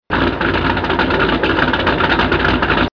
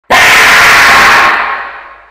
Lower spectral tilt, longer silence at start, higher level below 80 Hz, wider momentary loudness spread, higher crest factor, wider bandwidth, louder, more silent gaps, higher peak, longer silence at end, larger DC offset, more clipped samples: first, -7 dB/octave vs -0.5 dB/octave; about the same, 0.1 s vs 0.1 s; first, -28 dBFS vs -34 dBFS; second, 2 LU vs 14 LU; first, 12 dB vs 6 dB; second, 5.4 kHz vs 16.5 kHz; second, -15 LUFS vs -3 LUFS; neither; second, -4 dBFS vs 0 dBFS; second, 0.05 s vs 0.2 s; first, 0.2% vs under 0.1%; second, under 0.1% vs 0.2%